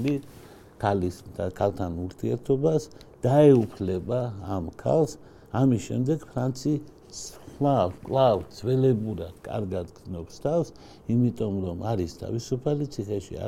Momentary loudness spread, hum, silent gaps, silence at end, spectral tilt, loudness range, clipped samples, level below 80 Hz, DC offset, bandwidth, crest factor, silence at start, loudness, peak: 12 LU; none; none; 0 s; -7.5 dB/octave; 5 LU; under 0.1%; -52 dBFS; under 0.1%; 14.5 kHz; 20 dB; 0 s; -26 LUFS; -6 dBFS